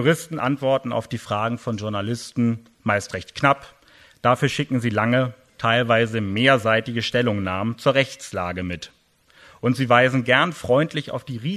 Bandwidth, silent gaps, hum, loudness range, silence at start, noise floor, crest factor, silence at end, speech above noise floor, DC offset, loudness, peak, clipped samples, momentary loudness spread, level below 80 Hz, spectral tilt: 13.5 kHz; none; none; 4 LU; 0 s; -54 dBFS; 20 dB; 0 s; 33 dB; under 0.1%; -22 LUFS; 0 dBFS; under 0.1%; 11 LU; -56 dBFS; -5.5 dB/octave